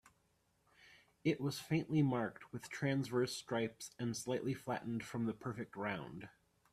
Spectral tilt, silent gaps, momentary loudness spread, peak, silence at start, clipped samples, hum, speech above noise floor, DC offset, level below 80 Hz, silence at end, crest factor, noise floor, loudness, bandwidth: -6 dB/octave; none; 10 LU; -24 dBFS; 0.85 s; under 0.1%; none; 38 dB; under 0.1%; -74 dBFS; 0.45 s; 18 dB; -78 dBFS; -40 LUFS; 14.5 kHz